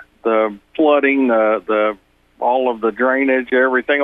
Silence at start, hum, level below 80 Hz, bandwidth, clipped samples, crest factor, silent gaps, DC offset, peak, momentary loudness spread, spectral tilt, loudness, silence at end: 0.25 s; none; -58 dBFS; 4 kHz; under 0.1%; 14 dB; none; under 0.1%; -2 dBFS; 6 LU; -7 dB/octave; -16 LUFS; 0 s